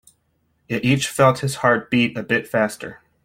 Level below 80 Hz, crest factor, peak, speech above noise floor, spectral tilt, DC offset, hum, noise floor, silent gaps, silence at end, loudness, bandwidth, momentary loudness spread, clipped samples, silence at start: -56 dBFS; 18 dB; -2 dBFS; 47 dB; -5 dB/octave; under 0.1%; none; -67 dBFS; none; 0.3 s; -19 LUFS; 16.5 kHz; 10 LU; under 0.1%; 0.7 s